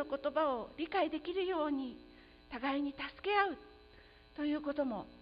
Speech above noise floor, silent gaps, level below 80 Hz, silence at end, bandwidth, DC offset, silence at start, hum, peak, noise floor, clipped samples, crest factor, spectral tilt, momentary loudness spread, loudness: 24 dB; none; -64 dBFS; 0.05 s; 5.2 kHz; under 0.1%; 0 s; none; -18 dBFS; -60 dBFS; under 0.1%; 20 dB; -2 dB/octave; 12 LU; -37 LUFS